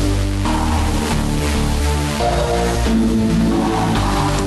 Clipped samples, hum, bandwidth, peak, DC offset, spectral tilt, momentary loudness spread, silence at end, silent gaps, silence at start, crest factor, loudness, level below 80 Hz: under 0.1%; none; 12.5 kHz; -6 dBFS; under 0.1%; -5.5 dB/octave; 3 LU; 0 s; none; 0 s; 10 dB; -18 LUFS; -22 dBFS